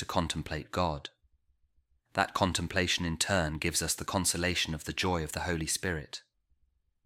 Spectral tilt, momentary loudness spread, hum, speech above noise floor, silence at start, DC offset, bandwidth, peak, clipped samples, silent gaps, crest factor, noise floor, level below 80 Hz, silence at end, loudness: -3.5 dB/octave; 8 LU; none; 42 dB; 0 s; under 0.1%; 16 kHz; -10 dBFS; under 0.1%; none; 22 dB; -73 dBFS; -50 dBFS; 0.85 s; -31 LUFS